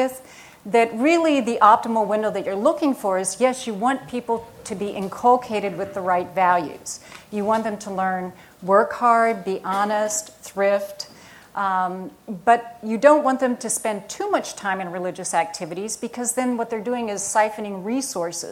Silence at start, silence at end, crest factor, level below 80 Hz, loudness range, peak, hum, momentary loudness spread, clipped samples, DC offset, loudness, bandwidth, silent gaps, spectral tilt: 0 s; 0 s; 22 dB; -64 dBFS; 5 LU; 0 dBFS; none; 12 LU; under 0.1%; under 0.1%; -22 LUFS; 17 kHz; none; -4 dB/octave